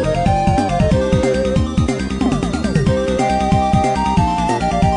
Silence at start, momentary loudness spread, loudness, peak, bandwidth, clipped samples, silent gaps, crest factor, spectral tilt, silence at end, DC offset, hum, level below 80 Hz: 0 s; 3 LU; -16 LUFS; -2 dBFS; 10.5 kHz; under 0.1%; none; 14 dB; -6.5 dB/octave; 0 s; 0.3%; none; -26 dBFS